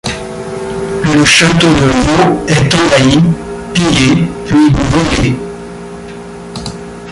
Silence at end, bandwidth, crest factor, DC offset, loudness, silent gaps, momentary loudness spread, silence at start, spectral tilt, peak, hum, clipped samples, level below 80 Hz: 0 s; 11.5 kHz; 10 dB; under 0.1%; -10 LUFS; none; 19 LU; 0.05 s; -5 dB/octave; 0 dBFS; none; under 0.1%; -28 dBFS